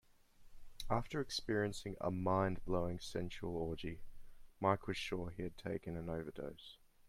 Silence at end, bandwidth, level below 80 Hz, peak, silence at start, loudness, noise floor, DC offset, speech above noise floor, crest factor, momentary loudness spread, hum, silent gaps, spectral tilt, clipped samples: 0 s; 15.5 kHz; -56 dBFS; -20 dBFS; 0.4 s; -41 LUFS; -62 dBFS; under 0.1%; 22 dB; 22 dB; 12 LU; none; none; -6 dB/octave; under 0.1%